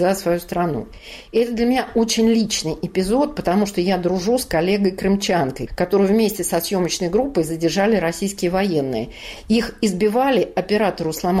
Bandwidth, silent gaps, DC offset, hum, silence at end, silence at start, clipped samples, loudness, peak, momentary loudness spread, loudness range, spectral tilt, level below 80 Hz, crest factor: 16 kHz; none; under 0.1%; none; 0 s; 0 s; under 0.1%; -19 LUFS; -8 dBFS; 6 LU; 1 LU; -5 dB/octave; -42 dBFS; 12 dB